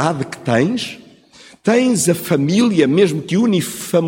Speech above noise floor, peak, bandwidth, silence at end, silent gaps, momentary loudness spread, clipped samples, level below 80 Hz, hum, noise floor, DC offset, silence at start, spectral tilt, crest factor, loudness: 29 dB; -2 dBFS; 17 kHz; 0 s; none; 8 LU; under 0.1%; -58 dBFS; none; -45 dBFS; under 0.1%; 0 s; -5 dB/octave; 14 dB; -16 LUFS